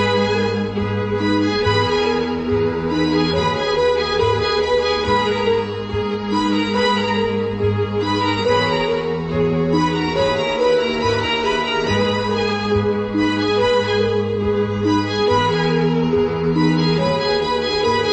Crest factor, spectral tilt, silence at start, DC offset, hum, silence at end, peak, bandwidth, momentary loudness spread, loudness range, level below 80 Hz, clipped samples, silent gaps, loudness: 14 dB; -6 dB/octave; 0 s; under 0.1%; none; 0 s; -4 dBFS; 8.4 kHz; 3 LU; 1 LU; -40 dBFS; under 0.1%; none; -18 LUFS